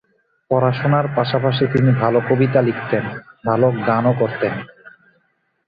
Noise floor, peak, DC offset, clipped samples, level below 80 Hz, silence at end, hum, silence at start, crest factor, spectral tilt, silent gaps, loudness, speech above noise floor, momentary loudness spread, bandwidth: -65 dBFS; -2 dBFS; under 0.1%; under 0.1%; -54 dBFS; 0.8 s; none; 0.5 s; 16 dB; -10 dB/octave; none; -18 LUFS; 48 dB; 7 LU; 5 kHz